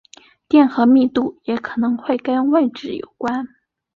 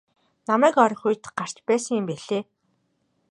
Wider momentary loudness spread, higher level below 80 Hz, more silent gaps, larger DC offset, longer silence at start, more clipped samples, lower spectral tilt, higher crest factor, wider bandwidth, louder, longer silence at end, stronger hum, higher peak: about the same, 13 LU vs 12 LU; first, -60 dBFS vs -76 dBFS; neither; neither; about the same, 0.5 s vs 0.5 s; neither; first, -6.5 dB/octave vs -4.5 dB/octave; second, 16 dB vs 22 dB; second, 7 kHz vs 11.5 kHz; first, -18 LUFS vs -23 LUFS; second, 0.5 s vs 0.9 s; neither; about the same, -2 dBFS vs -4 dBFS